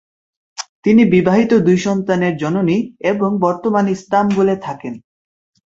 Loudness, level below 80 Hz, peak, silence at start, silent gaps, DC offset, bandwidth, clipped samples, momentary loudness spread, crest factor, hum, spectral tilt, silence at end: -15 LUFS; -54 dBFS; -2 dBFS; 0.6 s; 0.69-0.83 s; under 0.1%; 7.8 kHz; under 0.1%; 17 LU; 14 dB; none; -7 dB/octave; 0.8 s